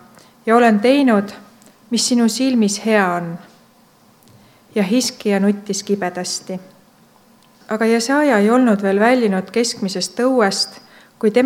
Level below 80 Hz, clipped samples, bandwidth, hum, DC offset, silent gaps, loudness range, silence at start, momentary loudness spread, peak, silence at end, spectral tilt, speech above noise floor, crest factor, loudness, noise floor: -70 dBFS; under 0.1%; 16 kHz; none; under 0.1%; none; 5 LU; 0.45 s; 11 LU; 0 dBFS; 0 s; -4.5 dB/octave; 35 dB; 18 dB; -17 LUFS; -51 dBFS